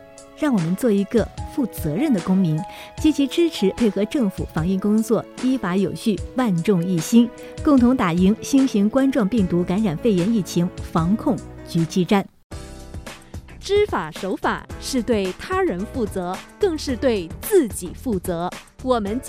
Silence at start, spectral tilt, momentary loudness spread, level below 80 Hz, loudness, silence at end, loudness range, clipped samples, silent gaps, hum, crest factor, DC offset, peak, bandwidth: 0 s; -6.5 dB/octave; 10 LU; -42 dBFS; -21 LUFS; 0 s; 5 LU; under 0.1%; 12.44-12.50 s; none; 18 dB; under 0.1%; -4 dBFS; 16 kHz